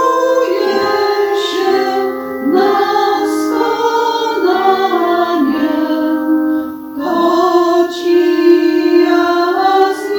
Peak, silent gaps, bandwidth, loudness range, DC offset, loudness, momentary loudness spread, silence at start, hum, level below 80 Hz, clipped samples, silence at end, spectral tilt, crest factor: 0 dBFS; none; 19 kHz; 2 LU; under 0.1%; -13 LUFS; 4 LU; 0 s; none; -56 dBFS; under 0.1%; 0 s; -4 dB/octave; 12 dB